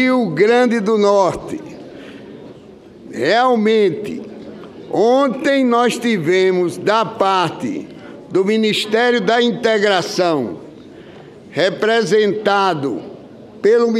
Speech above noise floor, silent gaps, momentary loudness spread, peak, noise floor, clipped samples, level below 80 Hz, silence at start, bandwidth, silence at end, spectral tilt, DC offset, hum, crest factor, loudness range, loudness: 25 dB; none; 20 LU; -2 dBFS; -40 dBFS; under 0.1%; -58 dBFS; 0 s; 14 kHz; 0 s; -5 dB/octave; under 0.1%; none; 16 dB; 3 LU; -16 LUFS